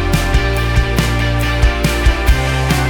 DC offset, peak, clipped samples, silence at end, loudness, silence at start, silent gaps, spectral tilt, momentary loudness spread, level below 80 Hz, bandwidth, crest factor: under 0.1%; 0 dBFS; under 0.1%; 0 s; -15 LUFS; 0 s; none; -5 dB/octave; 1 LU; -16 dBFS; 19 kHz; 12 dB